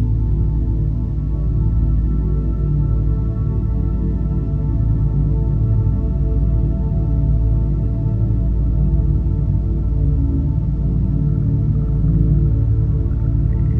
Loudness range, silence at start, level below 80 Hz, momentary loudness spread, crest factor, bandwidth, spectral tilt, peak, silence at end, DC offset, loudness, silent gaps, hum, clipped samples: 2 LU; 0 s; -18 dBFS; 3 LU; 14 dB; 1.9 kHz; -12.5 dB/octave; -2 dBFS; 0 s; under 0.1%; -19 LUFS; none; none; under 0.1%